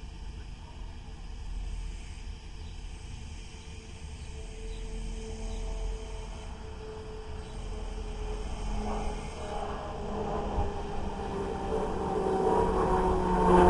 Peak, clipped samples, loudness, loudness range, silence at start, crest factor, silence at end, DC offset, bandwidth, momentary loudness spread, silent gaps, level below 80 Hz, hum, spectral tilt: -10 dBFS; under 0.1%; -35 LUFS; 13 LU; 0 s; 22 dB; 0 s; under 0.1%; 11.5 kHz; 18 LU; none; -38 dBFS; none; -6.5 dB/octave